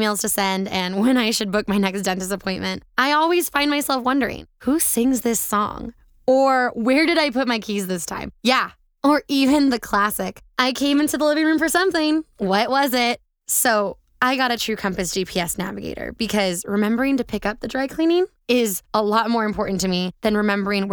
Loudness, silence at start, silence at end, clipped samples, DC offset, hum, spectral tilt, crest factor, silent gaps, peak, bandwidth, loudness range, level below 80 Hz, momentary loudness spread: -20 LUFS; 0 s; 0 s; under 0.1%; under 0.1%; none; -3.5 dB/octave; 20 dB; none; 0 dBFS; over 20 kHz; 3 LU; -48 dBFS; 8 LU